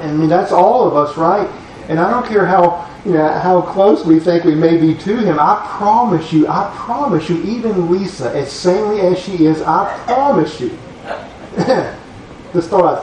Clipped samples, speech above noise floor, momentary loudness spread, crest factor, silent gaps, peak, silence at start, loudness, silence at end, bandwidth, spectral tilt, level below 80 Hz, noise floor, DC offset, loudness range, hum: under 0.1%; 21 dB; 12 LU; 14 dB; none; 0 dBFS; 0 s; -14 LUFS; 0 s; 9.6 kHz; -7 dB/octave; -46 dBFS; -34 dBFS; under 0.1%; 4 LU; none